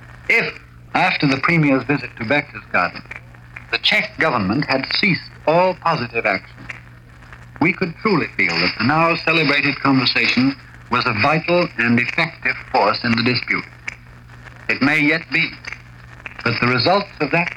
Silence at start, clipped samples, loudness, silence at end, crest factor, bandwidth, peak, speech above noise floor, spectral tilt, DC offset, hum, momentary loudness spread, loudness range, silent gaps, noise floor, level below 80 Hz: 0 s; under 0.1%; -17 LUFS; 0 s; 16 dB; 12 kHz; -2 dBFS; 24 dB; -6 dB/octave; under 0.1%; none; 17 LU; 4 LU; none; -41 dBFS; -48 dBFS